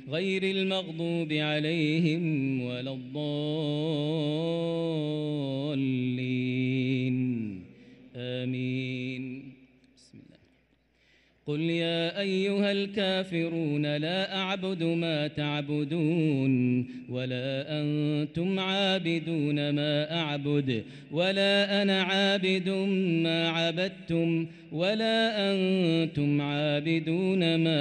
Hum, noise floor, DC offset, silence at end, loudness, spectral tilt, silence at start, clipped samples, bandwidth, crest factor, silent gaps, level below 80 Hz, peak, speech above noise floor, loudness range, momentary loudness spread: none; -67 dBFS; under 0.1%; 0 s; -28 LUFS; -6.5 dB/octave; 0 s; under 0.1%; 9.4 kHz; 14 dB; none; -70 dBFS; -14 dBFS; 39 dB; 7 LU; 8 LU